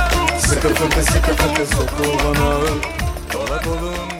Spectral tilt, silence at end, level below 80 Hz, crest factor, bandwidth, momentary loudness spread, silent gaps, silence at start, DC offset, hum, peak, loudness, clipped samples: -4 dB/octave; 0 s; -24 dBFS; 16 dB; 16.5 kHz; 7 LU; none; 0 s; under 0.1%; none; -2 dBFS; -18 LUFS; under 0.1%